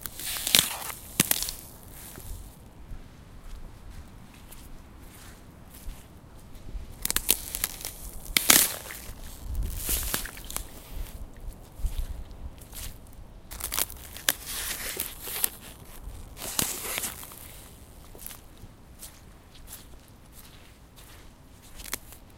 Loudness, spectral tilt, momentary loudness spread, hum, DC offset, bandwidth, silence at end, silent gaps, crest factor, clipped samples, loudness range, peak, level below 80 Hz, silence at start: -27 LUFS; -1 dB/octave; 25 LU; none; under 0.1%; 17 kHz; 0 s; none; 34 dB; under 0.1%; 22 LU; 0 dBFS; -42 dBFS; 0 s